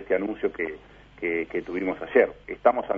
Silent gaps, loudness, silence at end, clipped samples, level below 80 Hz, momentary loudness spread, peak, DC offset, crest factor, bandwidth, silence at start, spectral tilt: none; -26 LUFS; 0 s; under 0.1%; -56 dBFS; 10 LU; -4 dBFS; under 0.1%; 22 dB; 5 kHz; 0 s; -8 dB/octave